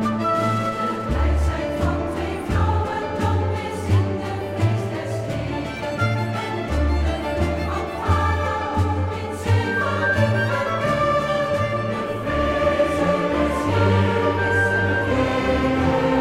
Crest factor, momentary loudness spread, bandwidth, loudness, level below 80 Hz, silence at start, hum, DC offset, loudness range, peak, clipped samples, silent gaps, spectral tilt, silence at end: 14 dB; 7 LU; 13.5 kHz; -22 LUFS; -32 dBFS; 0 s; none; under 0.1%; 4 LU; -6 dBFS; under 0.1%; none; -7 dB/octave; 0 s